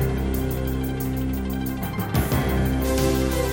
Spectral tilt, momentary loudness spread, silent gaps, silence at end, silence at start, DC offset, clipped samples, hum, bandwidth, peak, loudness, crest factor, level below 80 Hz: -6 dB/octave; 5 LU; none; 0 s; 0 s; under 0.1%; under 0.1%; none; 17 kHz; -10 dBFS; -24 LUFS; 14 dB; -28 dBFS